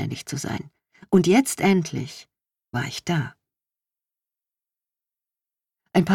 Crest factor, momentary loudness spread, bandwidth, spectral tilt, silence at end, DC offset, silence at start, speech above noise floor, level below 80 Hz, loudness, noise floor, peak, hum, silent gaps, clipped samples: 20 dB; 16 LU; 17 kHz; -5.5 dB/octave; 0 s; under 0.1%; 0 s; over 68 dB; -60 dBFS; -23 LUFS; under -90 dBFS; -6 dBFS; none; none; under 0.1%